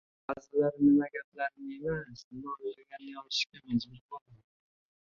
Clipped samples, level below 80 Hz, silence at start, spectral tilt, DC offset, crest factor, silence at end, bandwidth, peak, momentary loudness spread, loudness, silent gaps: under 0.1%; -66 dBFS; 0.3 s; -5.5 dB/octave; under 0.1%; 18 dB; 0.7 s; 7.2 kHz; -16 dBFS; 21 LU; -32 LUFS; 1.24-1.32 s, 2.24-2.31 s, 4.01-4.09 s, 4.21-4.26 s